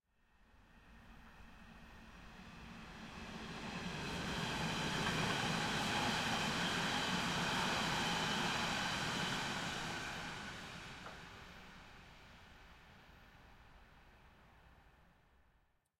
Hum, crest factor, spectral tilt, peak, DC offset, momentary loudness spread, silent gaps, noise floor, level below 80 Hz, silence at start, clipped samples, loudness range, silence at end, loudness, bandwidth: none; 18 dB; -3 dB/octave; -24 dBFS; under 0.1%; 23 LU; none; -76 dBFS; -60 dBFS; 0.55 s; under 0.1%; 19 LU; 1.1 s; -38 LUFS; 16.5 kHz